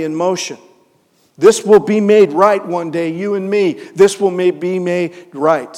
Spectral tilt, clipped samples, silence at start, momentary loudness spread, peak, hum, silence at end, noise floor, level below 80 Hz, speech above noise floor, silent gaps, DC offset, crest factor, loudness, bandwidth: -5 dB/octave; under 0.1%; 0 s; 9 LU; 0 dBFS; none; 0 s; -56 dBFS; -58 dBFS; 43 dB; none; under 0.1%; 14 dB; -14 LUFS; 13.5 kHz